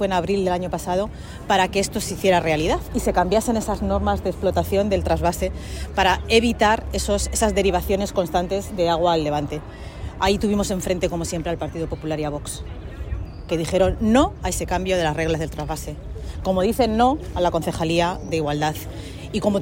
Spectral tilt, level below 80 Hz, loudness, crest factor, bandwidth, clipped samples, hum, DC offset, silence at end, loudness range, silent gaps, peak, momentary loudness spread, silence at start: -5 dB/octave; -34 dBFS; -22 LUFS; 18 dB; 16.5 kHz; under 0.1%; none; under 0.1%; 0 s; 4 LU; none; -4 dBFS; 13 LU; 0 s